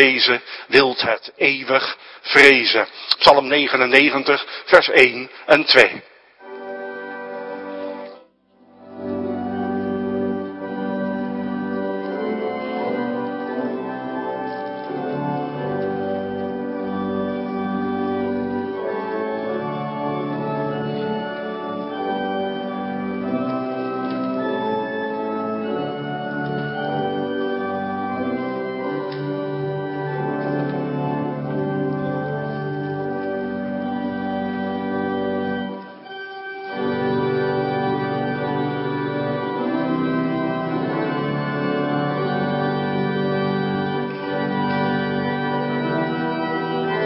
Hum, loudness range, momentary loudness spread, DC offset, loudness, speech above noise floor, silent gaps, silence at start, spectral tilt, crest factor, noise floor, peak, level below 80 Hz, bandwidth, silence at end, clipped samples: none; 11 LU; 13 LU; under 0.1%; -21 LUFS; 38 dB; none; 0 s; -6 dB/octave; 22 dB; -54 dBFS; 0 dBFS; -60 dBFS; 11 kHz; 0 s; under 0.1%